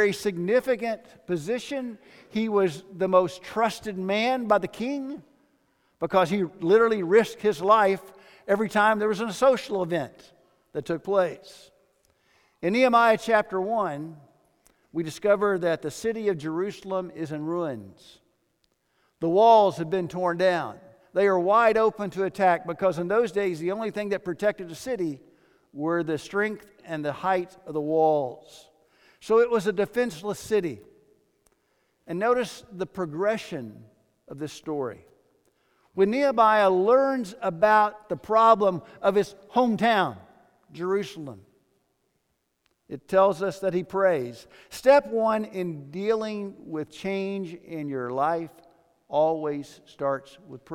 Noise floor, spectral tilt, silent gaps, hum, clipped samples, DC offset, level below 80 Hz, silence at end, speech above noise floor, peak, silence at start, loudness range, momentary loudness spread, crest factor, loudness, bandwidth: -75 dBFS; -5.5 dB/octave; none; none; under 0.1%; under 0.1%; -64 dBFS; 0 s; 50 dB; -6 dBFS; 0 s; 8 LU; 16 LU; 20 dB; -25 LUFS; 16.5 kHz